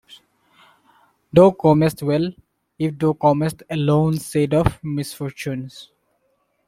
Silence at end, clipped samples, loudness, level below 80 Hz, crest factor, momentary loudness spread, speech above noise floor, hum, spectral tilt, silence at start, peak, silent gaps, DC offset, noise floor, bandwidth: 0.85 s; under 0.1%; -19 LUFS; -46 dBFS; 18 dB; 14 LU; 49 dB; none; -7.5 dB/octave; 0.1 s; -2 dBFS; none; under 0.1%; -67 dBFS; 15.5 kHz